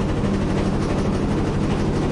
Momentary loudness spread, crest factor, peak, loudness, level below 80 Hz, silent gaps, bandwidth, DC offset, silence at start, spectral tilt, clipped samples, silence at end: 0 LU; 10 dB; -10 dBFS; -22 LUFS; -30 dBFS; none; 11.5 kHz; under 0.1%; 0 s; -7 dB/octave; under 0.1%; 0 s